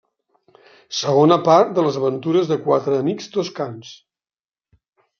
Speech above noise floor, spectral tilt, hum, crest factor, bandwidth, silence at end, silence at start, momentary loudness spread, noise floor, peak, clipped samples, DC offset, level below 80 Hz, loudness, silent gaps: over 72 dB; -6 dB/octave; none; 20 dB; 7.2 kHz; 1.25 s; 0.9 s; 13 LU; under -90 dBFS; 0 dBFS; under 0.1%; under 0.1%; -66 dBFS; -18 LUFS; none